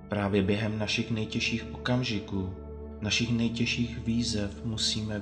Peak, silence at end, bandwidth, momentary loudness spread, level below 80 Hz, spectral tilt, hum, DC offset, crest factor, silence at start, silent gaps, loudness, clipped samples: -14 dBFS; 0 s; 9.8 kHz; 8 LU; -46 dBFS; -4.5 dB/octave; none; under 0.1%; 16 dB; 0 s; none; -29 LUFS; under 0.1%